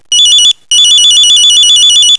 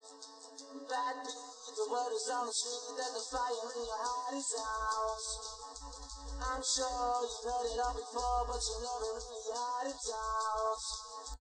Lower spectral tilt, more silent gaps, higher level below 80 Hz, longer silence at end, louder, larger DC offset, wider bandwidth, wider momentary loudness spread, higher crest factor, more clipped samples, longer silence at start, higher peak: second, 5 dB/octave vs -1.5 dB/octave; neither; first, -46 dBFS vs -52 dBFS; about the same, 0.05 s vs 0.05 s; first, -2 LUFS vs -37 LUFS; first, 0.4% vs under 0.1%; about the same, 11 kHz vs 11.5 kHz; second, 3 LU vs 12 LU; second, 6 dB vs 16 dB; first, 3% vs under 0.1%; about the same, 0.1 s vs 0.05 s; first, 0 dBFS vs -22 dBFS